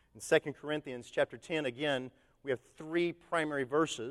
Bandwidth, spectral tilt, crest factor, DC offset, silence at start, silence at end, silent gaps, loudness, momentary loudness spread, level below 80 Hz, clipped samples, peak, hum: 13 kHz; -4.5 dB/octave; 22 dB; under 0.1%; 0.15 s; 0 s; none; -35 LUFS; 8 LU; -70 dBFS; under 0.1%; -14 dBFS; none